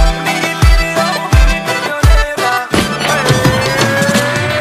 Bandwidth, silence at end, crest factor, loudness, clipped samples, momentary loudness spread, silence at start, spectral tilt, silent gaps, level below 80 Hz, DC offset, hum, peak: 16 kHz; 0 s; 12 dB; -12 LUFS; under 0.1%; 4 LU; 0 s; -4.5 dB/octave; none; -16 dBFS; under 0.1%; none; 0 dBFS